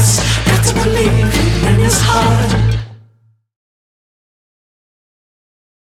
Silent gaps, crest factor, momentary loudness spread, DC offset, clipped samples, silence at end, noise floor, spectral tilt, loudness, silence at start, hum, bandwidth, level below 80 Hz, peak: none; 14 dB; 4 LU; under 0.1%; under 0.1%; 2.9 s; -52 dBFS; -4.5 dB/octave; -12 LUFS; 0 s; none; 15.5 kHz; -24 dBFS; 0 dBFS